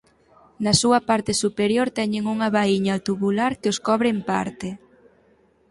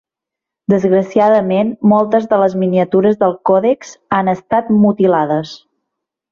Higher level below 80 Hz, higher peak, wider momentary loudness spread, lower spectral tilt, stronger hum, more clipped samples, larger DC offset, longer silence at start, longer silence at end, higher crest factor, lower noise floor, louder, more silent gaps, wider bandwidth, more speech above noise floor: about the same, -54 dBFS vs -56 dBFS; about the same, -4 dBFS vs -2 dBFS; about the same, 8 LU vs 6 LU; second, -4.5 dB/octave vs -8 dB/octave; neither; neither; neither; about the same, 0.6 s vs 0.7 s; first, 0.95 s vs 0.75 s; first, 18 dB vs 12 dB; second, -59 dBFS vs -84 dBFS; second, -21 LUFS vs -14 LUFS; neither; first, 11.5 kHz vs 7.2 kHz; second, 38 dB vs 71 dB